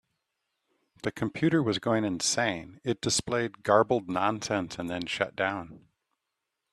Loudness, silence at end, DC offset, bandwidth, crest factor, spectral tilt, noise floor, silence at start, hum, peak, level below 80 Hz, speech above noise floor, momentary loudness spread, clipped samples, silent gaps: -28 LUFS; 0.95 s; under 0.1%; 13 kHz; 22 dB; -4 dB/octave; -84 dBFS; 1.05 s; none; -8 dBFS; -62 dBFS; 56 dB; 10 LU; under 0.1%; none